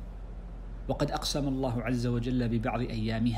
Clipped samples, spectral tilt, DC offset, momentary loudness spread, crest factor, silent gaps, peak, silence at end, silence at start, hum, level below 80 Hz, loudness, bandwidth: under 0.1%; -6 dB/octave; under 0.1%; 15 LU; 16 dB; none; -14 dBFS; 0 s; 0 s; none; -40 dBFS; -31 LUFS; 15.5 kHz